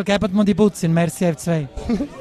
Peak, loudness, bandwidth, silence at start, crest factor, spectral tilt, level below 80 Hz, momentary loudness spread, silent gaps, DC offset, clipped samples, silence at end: -2 dBFS; -19 LUFS; 13.5 kHz; 0 s; 16 dB; -6.5 dB/octave; -40 dBFS; 7 LU; none; under 0.1%; under 0.1%; 0 s